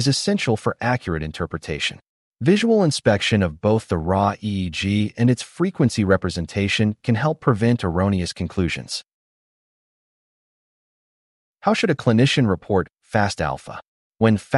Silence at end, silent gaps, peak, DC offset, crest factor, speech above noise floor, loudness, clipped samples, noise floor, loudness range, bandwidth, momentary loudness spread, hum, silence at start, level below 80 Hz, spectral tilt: 0 s; 2.09-2.32 s, 9.14-11.54 s, 13.88-14.12 s; -4 dBFS; under 0.1%; 18 dB; over 70 dB; -21 LUFS; under 0.1%; under -90 dBFS; 7 LU; 11.5 kHz; 9 LU; none; 0 s; -46 dBFS; -6 dB/octave